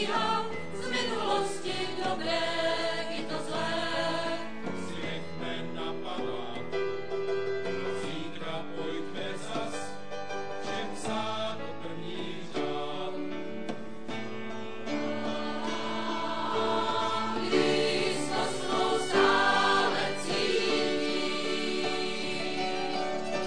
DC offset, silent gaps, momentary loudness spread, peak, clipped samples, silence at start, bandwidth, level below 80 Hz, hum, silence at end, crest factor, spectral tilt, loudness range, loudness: 1%; none; 11 LU; -10 dBFS; under 0.1%; 0 s; 10 kHz; -66 dBFS; none; 0 s; 20 dB; -4 dB/octave; 9 LU; -31 LUFS